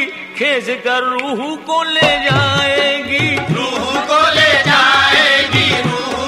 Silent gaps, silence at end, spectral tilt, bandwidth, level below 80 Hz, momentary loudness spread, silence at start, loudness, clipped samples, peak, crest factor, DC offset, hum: none; 0 s; -3.5 dB/octave; 15.5 kHz; -46 dBFS; 9 LU; 0 s; -12 LUFS; under 0.1%; 0 dBFS; 14 dB; under 0.1%; none